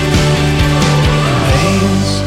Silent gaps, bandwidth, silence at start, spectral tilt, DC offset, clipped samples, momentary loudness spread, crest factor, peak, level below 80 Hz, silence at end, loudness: none; 15 kHz; 0 s; -5.5 dB/octave; under 0.1%; under 0.1%; 1 LU; 10 dB; -2 dBFS; -22 dBFS; 0 s; -12 LUFS